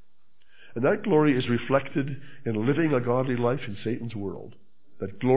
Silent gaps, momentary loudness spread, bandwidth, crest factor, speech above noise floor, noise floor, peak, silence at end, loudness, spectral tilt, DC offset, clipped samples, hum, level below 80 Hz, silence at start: none; 14 LU; 4 kHz; 20 dB; 45 dB; -70 dBFS; -6 dBFS; 0 s; -26 LUFS; -11.5 dB/octave; 1%; under 0.1%; none; -62 dBFS; 0 s